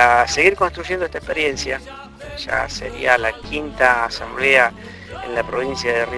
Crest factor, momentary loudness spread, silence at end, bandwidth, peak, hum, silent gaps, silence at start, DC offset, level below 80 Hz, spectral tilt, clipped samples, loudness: 20 dB; 17 LU; 0 s; 11 kHz; 0 dBFS; none; none; 0 s; under 0.1%; -40 dBFS; -3 dB/octave; under 0.1%; -18 LUFS